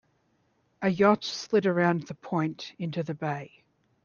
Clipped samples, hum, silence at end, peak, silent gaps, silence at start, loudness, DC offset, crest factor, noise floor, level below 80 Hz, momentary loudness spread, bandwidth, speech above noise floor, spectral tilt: under 0.1%; none; 0.55 s; -8 dBFS; none; 0.8 s; -28 LUFS; under 0.1%; 20 dB; -70 dBFS; -70 dBFS; 10 LU; 7.2 kHz; 43 dB; -6 dB/octave